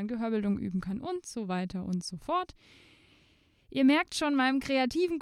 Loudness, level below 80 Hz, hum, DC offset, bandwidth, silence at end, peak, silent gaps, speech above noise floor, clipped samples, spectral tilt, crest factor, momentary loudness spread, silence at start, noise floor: -30 LUFS; -60 dBFS; none; under 0.1%; 13.5 kHz; 0 s; -14 dBFS; none; 35 dB; under 0.1%; -5 dB/octave; 16 dB; 11 LU; 0 s; -65 dBFS